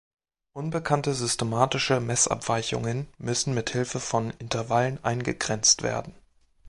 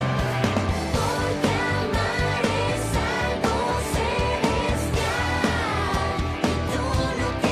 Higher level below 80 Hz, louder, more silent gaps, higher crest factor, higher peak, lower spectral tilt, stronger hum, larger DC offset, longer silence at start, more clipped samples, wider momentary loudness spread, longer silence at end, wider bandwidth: second, -54 dBFS vs -34 dBFS; about the same, -26 LUFS vs -24 LUFS; neither; first, 22 dB vs 16 dB; about the same, -6 dBFS vs -8 dBFS; second, -3.5 dB/octave vs -5 dB/octave; neither; neither; first, 0.55 s vs 0 s; neither; first, 9 LU vs 2 LU; about the same, 0 s vs 0 s; second, 11.5 kHz vs 15 kHz